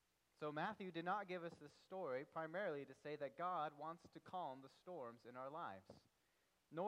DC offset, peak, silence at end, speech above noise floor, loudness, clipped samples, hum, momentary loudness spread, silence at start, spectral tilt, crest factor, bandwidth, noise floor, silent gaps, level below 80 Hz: under 0.1%; -32 dBFS; 0 s; 33 dB; -50 LUFS; under 0.1%; none; 12 LU; 0.4 s; -6.5 dB/octave; 18 dB; 13 kHz; -83 dBFS; none; under -90 dBFS